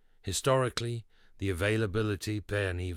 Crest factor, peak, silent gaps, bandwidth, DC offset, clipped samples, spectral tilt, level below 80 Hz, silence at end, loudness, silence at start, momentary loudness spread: 16 dB; -16 dBFS; none; 16 kHz; under 0.1%; under 0.1%; -5 dB/octave; -52 dBFS; 0 s; -31 LUFS; 0.25 s; 9 LU